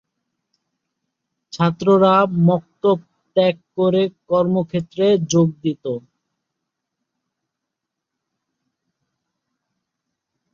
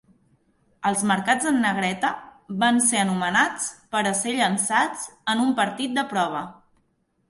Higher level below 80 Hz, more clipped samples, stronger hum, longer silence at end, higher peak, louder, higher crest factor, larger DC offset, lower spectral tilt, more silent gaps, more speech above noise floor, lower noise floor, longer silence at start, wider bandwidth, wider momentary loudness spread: about the same, -62 dBFS vs -66 dBFS; neither; neither; first, 4.55 s vs 0.75 s; first, -2 dBFS vs -6 dBFS; first, -18 LUFS vs -23 LUFS; about the same, 18 dB vs 18 dB; neither; first, -6.5 dB/octave vs -3 dB/octave; neither; first, 65 dB vs 46 dB; first, -82 dBFS vs -69 dBFS; first, 1.55 s vs 0.8 s; second, 7.4 kHz vs 12 kHz; about the same, 10 LU vs 8 LU